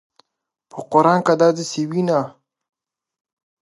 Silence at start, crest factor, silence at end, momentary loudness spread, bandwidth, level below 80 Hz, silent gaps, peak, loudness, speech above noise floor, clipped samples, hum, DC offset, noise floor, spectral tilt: 0.75 s; 20 dB; 1.35 s; 18 LU; 11.5 kHz; -72 dBFS; none; -2 dBFS; -18 LUFS; 62 dB; under 0.1%; none; under 0.1%; -79 dBFS; -6 dB/octave